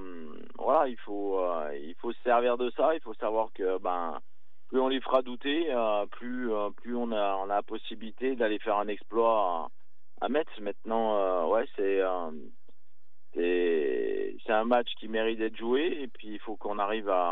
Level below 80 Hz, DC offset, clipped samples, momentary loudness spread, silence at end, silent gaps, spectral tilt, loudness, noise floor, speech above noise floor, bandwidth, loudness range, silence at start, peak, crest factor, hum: under -90 dBFS; 2%; under 0.1%; 12 LU; 0 s; none; -7.5 dB/octave; -30 LUFS; -81 dBFS; 51 dB; 4.5 kHz; 2 LU; 0 s; -12 dBFS; 18 dB; none